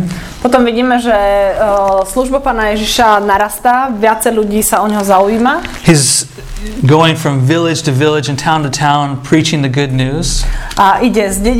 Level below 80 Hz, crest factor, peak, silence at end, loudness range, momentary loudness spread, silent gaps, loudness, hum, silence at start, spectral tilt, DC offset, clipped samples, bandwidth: -26 dBFS; 10 dB; 0 dBFS; 0 s; 2 LU; 5 LU; none; -11 LUFS; none; 0 s; -4.5 dB/octave; under 0.1%; 0.3%; 17 kHz